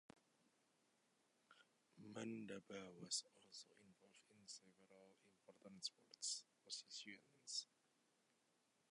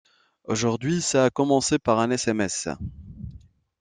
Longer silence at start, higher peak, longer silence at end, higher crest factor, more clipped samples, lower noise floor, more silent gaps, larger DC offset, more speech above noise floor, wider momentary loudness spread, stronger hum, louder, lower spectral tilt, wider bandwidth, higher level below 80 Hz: second, 0.15 s vs 0.5 s; second, -32 dBFS vs -6 dBFS; first, 1.25 s vs 0.45 s; first, 26 dB vs 20 dB; neither; first, -84 dBFS vs -49 dBFS; neither; neither; about the same, 28 dB vs 26 dB; about the same, 18 LU vs 20 LU; neither; second, -52 LUFS vs -23 LUFS; second, -1.5 dB/octave vs -4.5 dB/octave; about the same, 11 kHz vs 10.5 kHz; second, under -90 dBFS vs -50 dBFS